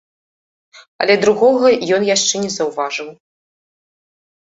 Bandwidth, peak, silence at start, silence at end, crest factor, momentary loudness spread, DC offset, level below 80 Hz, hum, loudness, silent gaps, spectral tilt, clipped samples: 8.2 kHz; 0 dBFS; 0.75 s; 1.35 s; 16 dB; 11 LU; under 0.1%; -62 dBFS; none; -15 LUFS; 0.88-0.99 s; -2.5 dB/octave; under 0.1%